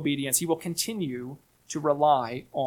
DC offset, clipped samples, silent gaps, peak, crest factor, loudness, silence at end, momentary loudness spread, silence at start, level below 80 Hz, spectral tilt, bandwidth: under 0.1%; under 0.1%; none; -8 dBFS; 20 dB; -27 LUFS; 0 s; 14 LU; 0 s; -66 dBFS; -4 dB/octave; 19 kHz